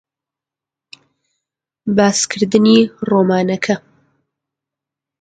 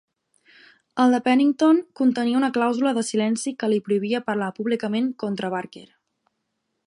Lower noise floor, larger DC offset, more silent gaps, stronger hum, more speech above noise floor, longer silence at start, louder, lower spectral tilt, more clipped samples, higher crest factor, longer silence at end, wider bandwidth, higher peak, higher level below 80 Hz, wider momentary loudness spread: first, -87 dBFS vs -77 dBFS; neither; neither; neither; first, 73 dB vs 55 dB; first, 1.85 s vs 0.95 s; first, -14 LUFS vs -22 LUFS; about the same, -4.5 dB/octave vs -5 dB/octave; neither; about the same, 18 dB vs 16 dB; first, 1.45 s vs 1 s; second, 9.4 kHz vs 11 kHz; first, 0 dBFS vs -6 dBFS; first, -58 dBFS vs -74 dBFS; about the same, 9 LU vs 9 LU